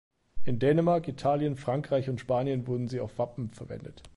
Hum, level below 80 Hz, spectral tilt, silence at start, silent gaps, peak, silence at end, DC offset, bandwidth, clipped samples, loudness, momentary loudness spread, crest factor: none; -56 dBFS; -8.5 dB/octave; 0.1 s; none; -14 dBFS; 0 s; under 0.1%; 11.5 kHz; under 0.1%; -29 LUFS; 15 LU; 16 dB